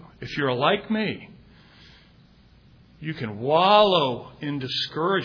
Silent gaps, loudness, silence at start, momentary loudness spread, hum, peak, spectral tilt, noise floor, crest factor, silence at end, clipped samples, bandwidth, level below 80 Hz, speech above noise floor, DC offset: none; -23 LUFS; 0.2 s; 16 LU; none; -4 dBFS; -6.5 dB/octave; -54 dBFS; 20 dB; 0 s; under 0.1%; 5.4 kHz; -58 dBFS; 31 dB; under 0.1%